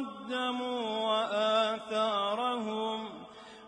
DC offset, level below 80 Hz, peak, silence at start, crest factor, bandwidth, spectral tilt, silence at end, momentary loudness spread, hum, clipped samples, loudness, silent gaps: under 0.1%; -76 dBFS; -16 dBFS; 0 s; 16 dB; 10.5 kHz; -4 dB/octave; 0 s; 10 LU; none; under 0.1%; -31 LUFS; none